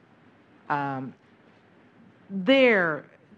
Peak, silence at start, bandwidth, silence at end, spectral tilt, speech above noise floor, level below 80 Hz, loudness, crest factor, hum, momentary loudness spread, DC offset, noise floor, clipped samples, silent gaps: -8 dBFS; 0.7 s; 7.4 kHz; 0.35 s; -6.5 dB/octave; 34 dB; -82 dBFS; -24 LUFS; 20 dB; none; 18 LU; under 0.1%; -57 dBFS; under 0.1%; none